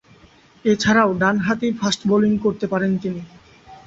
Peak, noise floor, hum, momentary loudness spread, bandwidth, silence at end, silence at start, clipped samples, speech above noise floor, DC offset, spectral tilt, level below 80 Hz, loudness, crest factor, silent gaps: -2 dBFS; -51 dBFS; none; 9 LU; 8 kHz; 0.1 s; 0.65 s; under 0.1%; 32 dB; under 0.1%; -5.5 dB/octave; -52 dBFS; -19 LUFS; 18 dB; none